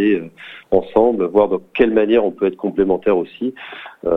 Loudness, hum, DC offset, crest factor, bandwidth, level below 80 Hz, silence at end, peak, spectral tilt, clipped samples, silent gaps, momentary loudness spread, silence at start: -17 LUFS; none; under 0.1%; 18 dB; 4.1 kHz; -46 dBFS; 0 s; 0 dBFS; -8.5 dB/octave; under 0.1%; none; 13 LU; 0 s